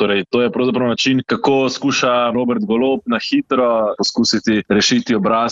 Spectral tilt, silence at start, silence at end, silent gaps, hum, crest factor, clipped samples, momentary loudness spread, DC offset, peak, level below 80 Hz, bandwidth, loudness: -4 dB/octave; 0 s; 0 s; none; none; 12 dB; under 0.1%; 3 LU; under 0.1%; -4 dBFS; -54 dBFS; 7.8 kHz; -16 LUFS